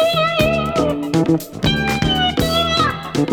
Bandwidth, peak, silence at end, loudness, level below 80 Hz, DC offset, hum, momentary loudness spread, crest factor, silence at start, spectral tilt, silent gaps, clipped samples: over 20 kHz; -2 dBFS; 0 s; -17 LUFS; -34 dBFS; under 0.1%; none; 3 LU; 16 dB; 0 s; -5 dB/octave; none; under 0.1%